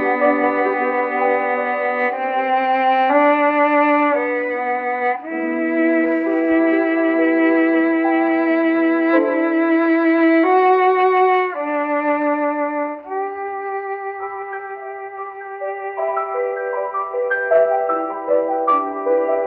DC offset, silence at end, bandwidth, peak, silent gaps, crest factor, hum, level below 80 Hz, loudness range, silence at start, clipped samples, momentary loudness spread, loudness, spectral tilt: under 0.1%; 0 s; 4.8 kHz; -4 dBFS; none; 14 dB; none; -68 dBFS; 9 LU; 0 s; under 0.1%; 11 LU; -18 LUFS; -7 dB/octave